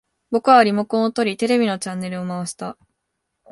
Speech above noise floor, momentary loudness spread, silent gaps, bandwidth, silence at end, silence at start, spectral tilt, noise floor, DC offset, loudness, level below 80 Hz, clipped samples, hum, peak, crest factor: 58 dB; 14 LU; none; 11.5 kHz; 0.8 s; 0.3 s; -5 dB/octave; -76 dBFS; under 0.1%; -19 LUFS; -66 dBFS; under 0.1%; none; 0 dBFS; 20 dB